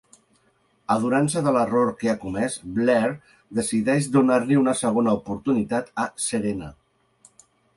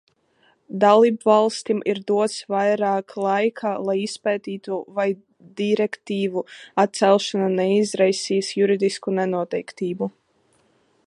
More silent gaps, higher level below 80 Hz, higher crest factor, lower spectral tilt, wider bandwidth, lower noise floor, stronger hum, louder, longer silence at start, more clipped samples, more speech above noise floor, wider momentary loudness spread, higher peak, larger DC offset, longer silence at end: neither; first, -56 dBFS vs -74 dBFS; about the same, 16 dB vs 20 dB; about the same, -5.5 dB/octave vs -5 dB/octave; about the same, 11.5 kHz vs 11.5 kHz; about the same, -64 dBFS vs -63 dBFS; neither; about the same, -23 LUFS vs -21 LUFS; first, 0.9 s vs 0.7 s; neither; about the same, 42 dB vs 42 dB; about the same, 9 LU vs 11 LU; second, -6 dBFS vs -2 dBFS; neither; about the same, 1.05 s vs 0.95 s